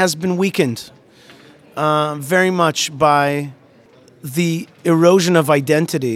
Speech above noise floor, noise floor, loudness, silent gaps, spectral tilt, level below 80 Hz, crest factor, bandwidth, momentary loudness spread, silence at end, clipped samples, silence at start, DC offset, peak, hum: 32 dB; -48 dBFS; -16 LUFS; none; -5 dB/octave; -60 dBFS; 16 dB; 16 kHz; 12 LU; 0 s; under 0.1%; 0 s; under 0.1%; 0 dBFS; none